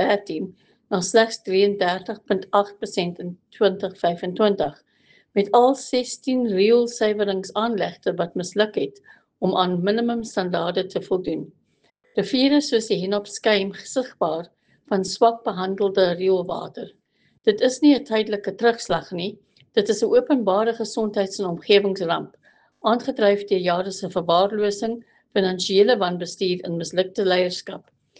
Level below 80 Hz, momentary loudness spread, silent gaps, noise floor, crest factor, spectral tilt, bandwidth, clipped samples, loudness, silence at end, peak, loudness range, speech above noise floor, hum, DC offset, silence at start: -64 dBFS; 11 LU; none; -65 dBFS; 18 dB; -4.5 dB/octave; 9.6 kHz; under 0.1%; -22 LUFS; 0.4 s; -4 dBFS; 3 LU; 43 dB; none; under 0.1%; 0 s